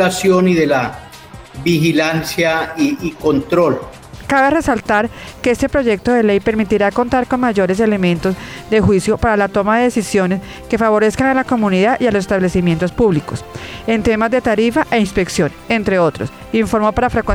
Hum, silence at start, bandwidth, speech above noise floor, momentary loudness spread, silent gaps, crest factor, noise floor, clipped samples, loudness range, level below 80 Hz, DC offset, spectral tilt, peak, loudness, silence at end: none; 0 s; 16.5 kHz; 21 dB; 8 LU; none; 12 dB; -36 dBFS; under 0.1%; 1 LU; -36 dBFS; under 0.1%; -6 dB/octave; -2 dBFS; -15 LUFS; 0 s